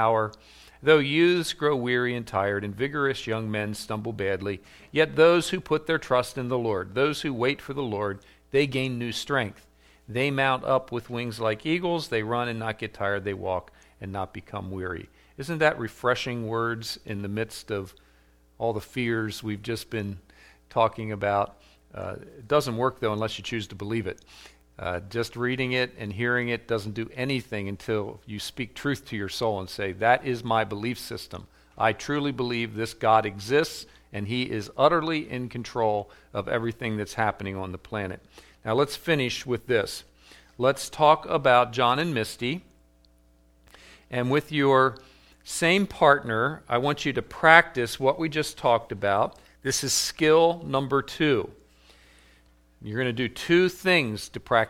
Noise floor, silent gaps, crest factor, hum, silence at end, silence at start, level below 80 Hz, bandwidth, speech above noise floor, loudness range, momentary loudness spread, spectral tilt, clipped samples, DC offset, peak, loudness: -60 dBFS; none; 26 dB; none; 0 s; 0 s; -56 dBFS; 16.5 kHz; 34 dB; 7 LU; 13 LU; -4.5 dB/octave; under 0.1%; under 0.1%; 0 dBFS; -26 LUFS